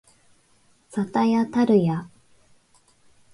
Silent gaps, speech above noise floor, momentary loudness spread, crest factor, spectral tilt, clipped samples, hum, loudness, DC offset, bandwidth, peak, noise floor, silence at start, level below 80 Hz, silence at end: none; 40 dB; 12 LU; 18 dB; -8 dB/octave; under 0.1%; none; -22 LUFS; under 0.1%; 11 kHz; -8 dBFS; -60 dBFS; 0.95 s; -66 dBFS; 1.25 s